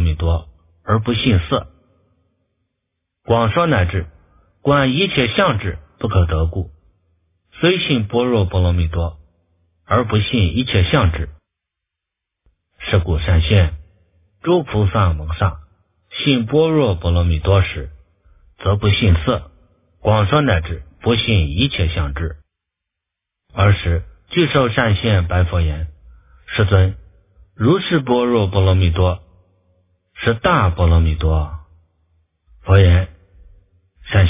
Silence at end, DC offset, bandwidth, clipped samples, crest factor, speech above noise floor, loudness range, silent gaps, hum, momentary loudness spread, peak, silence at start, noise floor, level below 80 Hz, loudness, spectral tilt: 0 s; under 0.1%; 3.8 kHz; under 0.1%; 18 dB; 67 dB; 3 LU; none; none; 12 LU; 0 dBFS; 0 s; -82 dBFS; -26 dBFS; -17 LUFS; -11 dB/octave